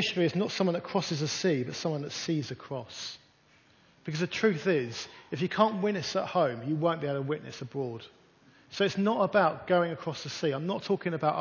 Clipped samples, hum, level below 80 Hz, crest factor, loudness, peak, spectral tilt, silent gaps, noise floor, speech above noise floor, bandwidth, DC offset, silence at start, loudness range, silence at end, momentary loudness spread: under 0.1%; none; -70 dBFS; 20 dB; -30 LUFS; -10 dBFS; -5.5 dB/octave; none; -63 dBFS; 33 dB; 7.2 kHz; under 0.1%; 0 s; 4 LU; 0 s; 12 LU